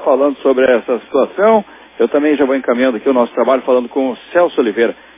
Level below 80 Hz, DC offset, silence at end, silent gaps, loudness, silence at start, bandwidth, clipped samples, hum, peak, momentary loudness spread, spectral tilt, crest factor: -58 dBFS; under 0.1%; 0.25 s; none; -14 LUFS; 0 s; 3.9 kHz; under 0.1%; none; 0 dBFS; 5 LU; -9 dB/octave; 14 dB